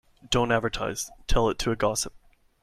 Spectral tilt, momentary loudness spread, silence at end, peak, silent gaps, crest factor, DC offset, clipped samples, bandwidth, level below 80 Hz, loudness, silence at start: -4 dB/octave; 7 LU; 0.45 s; -10 dBFS; none; 18 dB; under 0.1%; under 0.1%; 15.5 kHz; -36 dBFS; -27 LUFS; 0.25 s